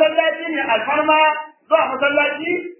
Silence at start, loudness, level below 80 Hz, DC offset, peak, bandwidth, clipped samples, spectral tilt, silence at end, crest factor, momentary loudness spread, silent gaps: 0 s; -17 LUFS; -70 dBFS; under 0.1%; -2 dBFS; 3.2 kHz; under 0.1%; -6.5 dB/octave; 0.05 s; 16 dB; 7 LU; none